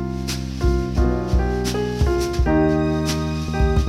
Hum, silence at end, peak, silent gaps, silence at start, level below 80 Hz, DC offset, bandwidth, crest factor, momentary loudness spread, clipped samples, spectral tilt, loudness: none; 0 s; -6 dBFS; none; 0 s; -24 dBFS; under 0.1%; 14 kHz; 12 dB; 6 LU; under 0.1%; -6.5 dB/octave; -21 LUFS